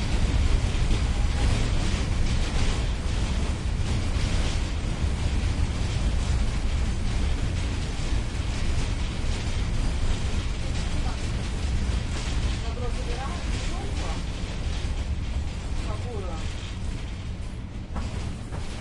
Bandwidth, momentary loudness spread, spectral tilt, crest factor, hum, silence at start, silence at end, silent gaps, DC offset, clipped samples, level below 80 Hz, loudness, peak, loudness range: 11 kHz; 7 LU; -5 dB/octave; 16 dB; none; 0 s; 0 s; none; under 0.1%; under 0.1%; -28 dBFS; -29 LUFS; -10 dBFS; 5 LU